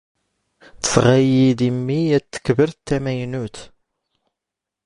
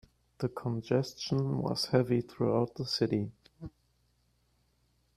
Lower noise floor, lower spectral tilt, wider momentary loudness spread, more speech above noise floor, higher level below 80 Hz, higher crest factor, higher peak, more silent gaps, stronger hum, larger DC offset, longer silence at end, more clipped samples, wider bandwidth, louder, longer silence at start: first, -85 dBFS vs -72 dBFS; about the same, -6 dB/octave vs -6.5 dB/octave; second, 11 LU vs 17 LU; first, 67 dB vs 41 dB; first, -48 dBFS vs -64 dBFS; about the same, 20 dB vs 20 dB; first, 0 dBFS vs -12 dBFS; neither; neither; neither; second, 1.2 s vs 1.5 s; neither; second, 11 kHz vs 13.5 kHz; first, -18 LUFS vs -32 LUFS; first, 0.85 s vs 0.4 s